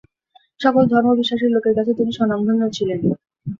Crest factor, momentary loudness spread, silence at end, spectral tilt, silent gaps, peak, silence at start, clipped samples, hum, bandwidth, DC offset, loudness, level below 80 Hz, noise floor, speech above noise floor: 16 dB; 6 LU; 0.05 s; -7 dB/octave; none; -2 dBFS; 0.6 s; under 0.1%; none; 7.4 kHz; under 0.1%; -18 LUFS; -54 dBFS; -57 dBFS; 40 dB